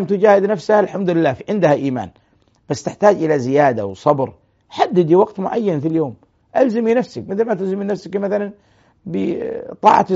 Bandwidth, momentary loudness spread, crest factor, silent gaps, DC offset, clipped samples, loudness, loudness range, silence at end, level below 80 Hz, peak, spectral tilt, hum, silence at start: 8 kHz; 12 LU; 16 dB; none; under 0.1%; under 0.1%; -17 LUFS; 4 LU; 0 s; -60 dBFS; 0 dBFS; -6 dB/octave; none; 0 s